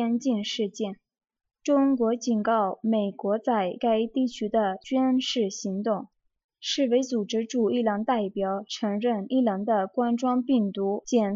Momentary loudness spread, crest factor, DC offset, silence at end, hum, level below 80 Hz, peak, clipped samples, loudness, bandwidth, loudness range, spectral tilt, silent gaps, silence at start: 6 LU; 14 dB; under 0.1%; 0 s; none; -70 dBFS; -10 dBFS; under 0.1%; -26 LUFS; 7.6 kHz; 2 LU; -5 dB/octave; 6.44-6.49 s; 0 s